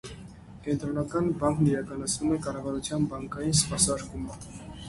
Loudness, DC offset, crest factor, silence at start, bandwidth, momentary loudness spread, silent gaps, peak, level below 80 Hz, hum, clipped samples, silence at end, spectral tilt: -28 LUFS; under 0.1%; 20 dB; 0.05 s; 11.5 kHz; 17 LU; none; -8 dBFS; -48 dBFS; none; under 0.1%; 0 s; -4.5 dB/octave